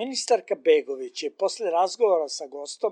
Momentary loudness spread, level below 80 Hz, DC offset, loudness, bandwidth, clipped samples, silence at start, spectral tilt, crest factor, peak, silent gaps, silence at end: 11 LU; under -90 dBFS; under 0.1%; -25 LUFS; 10.5 kHz; under 0.1%; 0 s; -1.5 dB/octave; 16 dB; -8 dBFS; none; 0 s